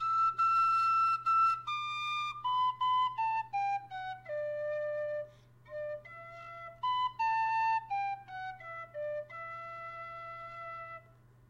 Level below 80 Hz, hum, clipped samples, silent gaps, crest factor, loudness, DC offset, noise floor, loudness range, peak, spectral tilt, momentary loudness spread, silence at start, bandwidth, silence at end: -72 dBFS; none; under 0.1%; none; 12 dB; -33 LUFS; under 0.1%; -60 dBFS; 10 LU; -22 dBFS; -3 dB/octave; 17 LU; 0 s; 11.5 kHz; 0.45 s